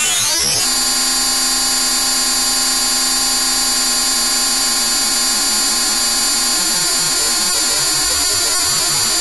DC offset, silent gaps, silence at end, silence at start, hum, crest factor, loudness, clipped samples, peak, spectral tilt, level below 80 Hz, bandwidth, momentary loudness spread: 1%; none; 0 s; 0 s; none; 10 dB; -12 LUFS; under 0.1%; -6 dBFS; 1 dB/octave; -40 dBFS; 11 kHz; 0 LU